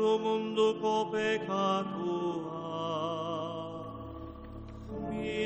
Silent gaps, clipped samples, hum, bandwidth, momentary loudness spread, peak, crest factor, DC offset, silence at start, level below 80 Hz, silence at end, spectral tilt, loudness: none; under 0.1%; none; 8.6 kHz; 16 LU; -16 dBFS; 16 dB; under 0.1%; 0 s; -56 dBFS; 0 s; -5.5 dB/octave; -33 LUFS